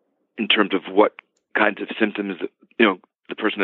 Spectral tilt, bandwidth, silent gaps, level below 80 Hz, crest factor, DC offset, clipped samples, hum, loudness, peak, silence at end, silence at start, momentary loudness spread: -7.5 dB/octave; 4.3 kHz; none; -74 dBFS; 20 dB; under 0.1%; under 0.1%; none; -21 LUFS; -2 dBFS; 0 s; 0.35 s; 14 LU